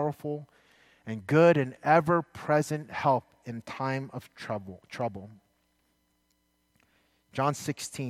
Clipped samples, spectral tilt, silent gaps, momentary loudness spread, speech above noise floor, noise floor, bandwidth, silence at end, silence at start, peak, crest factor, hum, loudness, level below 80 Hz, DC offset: under 0.1%; -6 dB/octave; none; 19 LU; 44 dB; -73 dBFS; 15 kHz; 0 s; 0 s; -8 dBFS; 22 dB; none; -28 LUFS; -68 dBFS; under 0.1%